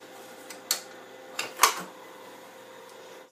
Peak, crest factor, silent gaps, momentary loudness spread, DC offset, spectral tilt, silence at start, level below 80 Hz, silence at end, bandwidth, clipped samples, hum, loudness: 0 dBFS; 32 dB; none; 23 LU; under 0.1%; 0.5 dB/octave; 0 s; -90 dBFS; 0.05 s; 15.5 kHz; under 0.1%; none; -28 LUFS